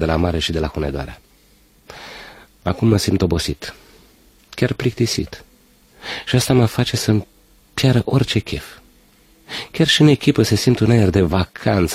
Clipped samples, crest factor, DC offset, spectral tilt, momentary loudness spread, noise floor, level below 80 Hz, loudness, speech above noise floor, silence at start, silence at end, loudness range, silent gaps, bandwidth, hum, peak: under 0.1%; 18 dB; under 0.1%; -5.5 dB/octave; 19 LU; -53 dBFS; -36 dBFS; -18 LUFS; 36 dB; 0 s; 0 s; 6 LU; none; 15.5 kHz; none; 0 dBFS